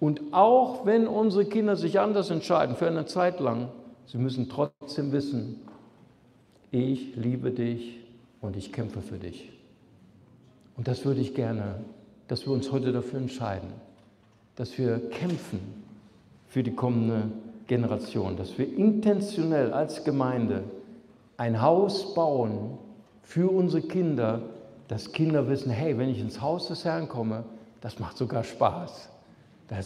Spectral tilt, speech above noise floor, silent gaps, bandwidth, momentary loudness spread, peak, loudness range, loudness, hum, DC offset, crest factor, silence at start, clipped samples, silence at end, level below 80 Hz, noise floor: -7.5 dB/octave; 33 dB; none; 12 kHz; 16 LU; -6 dBFS; 7 LU; -28 LUFS; none; under 0.1%; 22 dB; 0 s; under 0.1%; 0 s; -66 dBFS; -60 dBFS